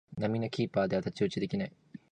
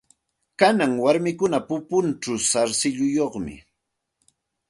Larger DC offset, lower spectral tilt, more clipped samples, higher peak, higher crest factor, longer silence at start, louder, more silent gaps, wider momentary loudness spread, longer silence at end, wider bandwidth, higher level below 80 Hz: neither; first, -7 dB/octave vs -4 dB/octave; neither; second, -16 dBFS vs -2 dBFS; second, 16 dB vs 22 dB; second, 0.1 s vs 0.6 s; second, -33 LUFS vs -22 LUFS; neither; about the same, 5 LU vs 7 LU; second, 0.15 s vs 1.1 s; second, 9.4 kHz vs 11.5 kHz; about the same, -62 dBFS vs -58 dBFS